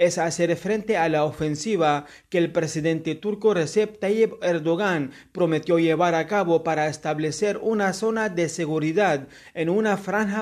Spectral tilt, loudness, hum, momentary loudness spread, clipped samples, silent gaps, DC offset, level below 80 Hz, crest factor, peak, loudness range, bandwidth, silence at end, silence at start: -5.5 dB/octave; -23 LUFS; none; 5 LU; under 0.1%; none; under 0.1%; -60 dBFS; 16 dB; -6 dBFS; 1 LU; 14 kHz; 0 s; 0 s